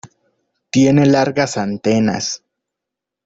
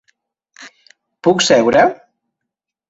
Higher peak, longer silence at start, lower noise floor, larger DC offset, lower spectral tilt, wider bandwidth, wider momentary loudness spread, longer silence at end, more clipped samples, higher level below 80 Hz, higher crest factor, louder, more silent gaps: about the same, -2 dBFS vs -2 dBFS; second, 0.05 s vs 0.6 s; about the same, -83 dBFS vs -81 dBFS; neither; first, -5.5 dB/octave vs -3.5 dB/octave; about the same, 8 kHz vs 8.2 kHz; first, 10 LU vs 6 LU; about the same, 0.9 s vs 0.95 s; neither; about the same, -54 dBFS vs -56 dBFS; about the same, 16 dB vs 16 dB; second, -16 LUFS vs -13 LUFS; neither